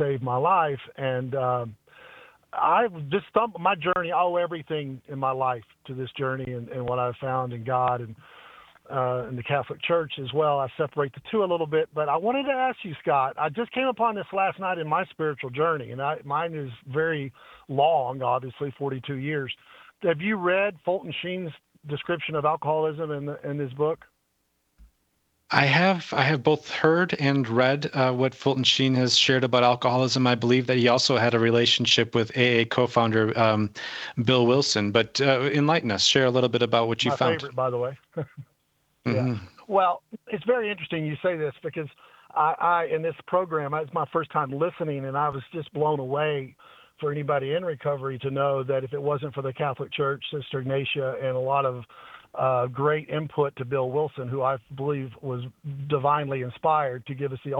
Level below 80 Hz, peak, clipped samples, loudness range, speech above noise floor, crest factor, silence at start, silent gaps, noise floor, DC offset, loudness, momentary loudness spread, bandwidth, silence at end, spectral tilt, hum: -64 dBFS; -2 dBFS; under 0.1%; 7 LU; 48 dB; 24 dB; 0 s; none; -73 dBFS; under 0.1%; -25 LUFS; 11 LU; 8.4 kHz; 0 s; -5 dB/octave; none